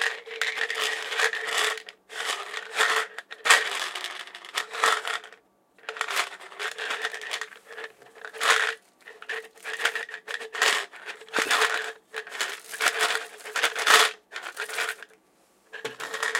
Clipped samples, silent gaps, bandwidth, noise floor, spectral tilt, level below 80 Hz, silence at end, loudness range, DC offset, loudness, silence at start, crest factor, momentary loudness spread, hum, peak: under 0.1%; none; 17 kHz; -63 dBFS; 2 dB/octave; -86 dBFS; 0 s; 5 LU; under 0.1%; -26 LUFS; 0 s; 28 dB; 17 LU; none; 0 dBFS